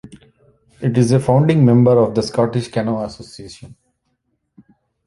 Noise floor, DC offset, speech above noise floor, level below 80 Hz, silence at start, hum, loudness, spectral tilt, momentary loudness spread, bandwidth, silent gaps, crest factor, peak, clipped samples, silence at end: -69 dBFS; under 0.1%; 54 dB; -50 dBFS; 0.8 s; none; -15 LUFS; -8 dB/octave; 23 LU; 11.5 kHz; none; 16 dB; -2 dBFS; under 0.1%; 1.4 s